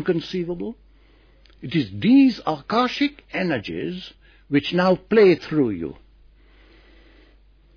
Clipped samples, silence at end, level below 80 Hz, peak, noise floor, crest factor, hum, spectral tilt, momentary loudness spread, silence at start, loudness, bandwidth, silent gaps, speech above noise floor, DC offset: under 0.1%; 1.85 s; -52 dBFS; -6 dBFS; -53 dBFS; 16 dB; none; -7.5 dB/octave; 16 LU; 0 s; -21 LUFS; 5.4 kHz; none; 33 dB; under 0.1%